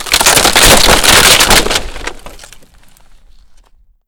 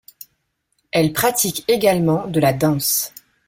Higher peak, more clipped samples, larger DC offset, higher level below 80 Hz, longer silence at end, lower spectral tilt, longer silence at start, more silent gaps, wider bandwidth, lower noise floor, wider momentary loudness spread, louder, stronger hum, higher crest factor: first, 0 dBFS vs -4 dBFS; first, 0.7% vs under 0.1%; neither; first, -22 dBFS vs -52 dBFS; first, 1.7 s vs 0.4 s; second, -1 dB/octave vs -4.5 dB/octave; second, 0 s vs 0.95 s; neither; first, over 20 kHz vs 17 kHz; second, -45 dBFS vs -70 dBFS; first, 20 LU vs 4 LU; first, -5 LUFS vs -18 LUFS; neither; second, 10 dB vs 16 dB